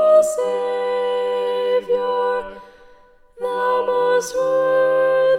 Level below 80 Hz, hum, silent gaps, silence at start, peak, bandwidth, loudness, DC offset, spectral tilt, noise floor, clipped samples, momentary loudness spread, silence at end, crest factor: -56 dBFS; none; none; 0 s; -4 dBFS; 14.5 kHz; -19 LUFS; under 0.1%; -3 dB/octave; -49 dBFS; under 0.1%; 6 LU; 0 s; 14 dB